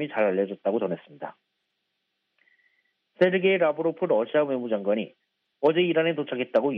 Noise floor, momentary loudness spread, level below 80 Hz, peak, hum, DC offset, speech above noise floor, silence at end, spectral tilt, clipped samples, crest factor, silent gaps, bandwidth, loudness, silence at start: -78 dBFS; 12 LU; -80 dBFS; -8 dBFS; none; under 0.1%; 54 dB; 0 s; -4 dB/octave; under 0.1%; 18 dB; none; 5.4 kHz; -25 LUFS; 0 s